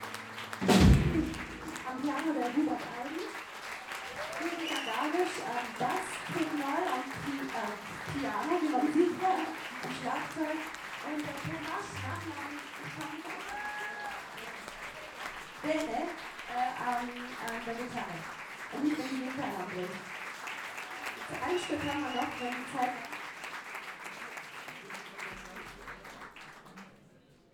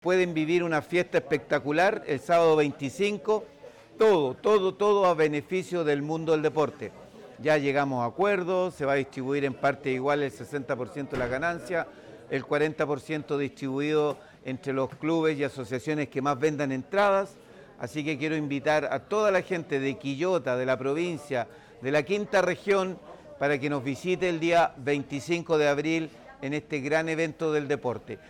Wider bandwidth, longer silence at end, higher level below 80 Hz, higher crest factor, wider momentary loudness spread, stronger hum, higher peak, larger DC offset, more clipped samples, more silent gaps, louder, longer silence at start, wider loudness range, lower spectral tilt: first, 19.5 kHz vs 13.5 kHz; first, 0.35 s vs 0.1 s; first, -46 dBFS vs -64 dBFS; first, 24 dB vs 12 dB; about the same, 11 LU vs 9 LU; neither; first, -10 dBFS vs -14 dBFS; neither; neither; neither; second, -35 LUFS vs -27 LUFS; about the same, 0 s vs 0.05 s; first, 8 LU vs 4 LU; about the same, -5 dB/octave vs -6 dB/octave